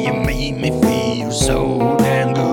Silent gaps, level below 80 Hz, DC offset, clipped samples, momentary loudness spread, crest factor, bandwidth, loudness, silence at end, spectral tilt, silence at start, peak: none; -30 dBFS; under 0.1%; under 0.1%; 4 LU; 16 dB; 18 kHz; -17 LUFS; 0 s; -5.5 dB/octave; 0 s; 0 dBFS